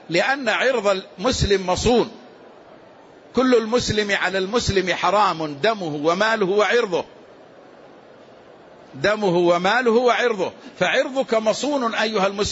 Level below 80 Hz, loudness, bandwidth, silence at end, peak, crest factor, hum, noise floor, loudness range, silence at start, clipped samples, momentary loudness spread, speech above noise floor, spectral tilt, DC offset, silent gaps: -42 dBFS; -20 LUFS; 8 kHz; 0 s; -6 dBFS; 14 dB; none; -46 dBFS; 4 LU; 0.1 s; under 0.1%; 6 LU; 27 dB; -4 dB/octave; under 0.1%; none